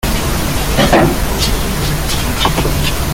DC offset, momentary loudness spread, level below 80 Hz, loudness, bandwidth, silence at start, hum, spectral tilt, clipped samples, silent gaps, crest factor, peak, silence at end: under 0.1%; 6 LU; -20 dBFS; -14 LUFS; 17 kHz; 0.05 s; none; -4 dB/octave; under 0.1%; none; 12 dB; 0 dBFS; 0 s